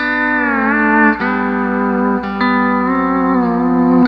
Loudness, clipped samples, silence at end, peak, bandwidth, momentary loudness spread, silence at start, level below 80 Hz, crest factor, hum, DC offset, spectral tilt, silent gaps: -14 LUFS; under 0.1%; 0 s; 0 dBFS; 5.4 kHz; 4 LU; 0 s; -40 dBFS; 14 dB; 60 Hz at -40 dBFS; under 0.1%; -9 dB/octave; none